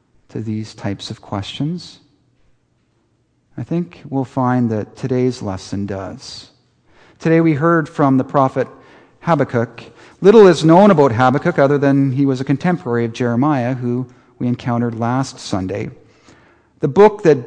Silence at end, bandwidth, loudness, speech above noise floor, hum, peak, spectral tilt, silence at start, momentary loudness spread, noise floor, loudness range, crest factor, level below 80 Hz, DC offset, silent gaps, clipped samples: 0 s; 9.8 kHz; -16 LUFS; 46 dB; none; 0 dBFS; -7.5 dB/octave; 0.35 s; 16 LU; -61 dBFS; 13 LU; 16 dB; -54 dBFS; under 0.1%; none; under 0.1%